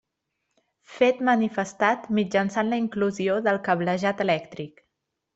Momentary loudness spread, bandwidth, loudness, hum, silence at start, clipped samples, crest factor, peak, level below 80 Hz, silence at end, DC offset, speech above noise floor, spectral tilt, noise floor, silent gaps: 5 LU; 8 kHz; -24 LUFS; none; 0.9 s; under 0.1%; 18 dB; -6 dBFS; -68 dBFS; 0.65 s; under 0.1%; 56 dB; -6 dB/octave; -80 dBFS; none